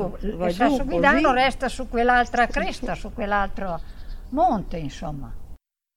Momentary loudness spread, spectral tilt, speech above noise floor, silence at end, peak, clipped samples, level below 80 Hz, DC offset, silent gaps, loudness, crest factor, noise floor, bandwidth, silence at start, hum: 16 LU; -5.5 dB/octave; 21 dB; 0.4 s; -4 dBFS; under 0.1%; -34 dBFS; under 0.1%; none; -22 LUFS; 20 dB; -43 dBFS; 13.5 kHz; 0 s; none